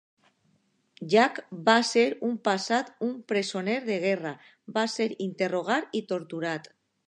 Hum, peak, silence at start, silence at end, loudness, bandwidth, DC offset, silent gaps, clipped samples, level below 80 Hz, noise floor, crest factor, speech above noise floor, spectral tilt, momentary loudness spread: none; -6 dBFS; 1 s; 0.45 s; -27 LUFS; 10.5 kHz; under 0.1%; none; under 0.1%; -82 dBFS; -70 dBFS; 22 dB; 43 dB; -4 dB/octave; 11 LU